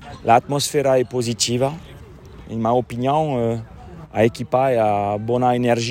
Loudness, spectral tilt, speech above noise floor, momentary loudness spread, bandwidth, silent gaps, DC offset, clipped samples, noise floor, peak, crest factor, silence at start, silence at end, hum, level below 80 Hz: -19 LUFS; -5 dB/octave; 21 dB; 12 LU; 16 kHz; none; under 0.1%; under 0.1%; -40 dBFS; -2 dBFS; 18 dB; 0 s; 0 s; none; -48 dBFS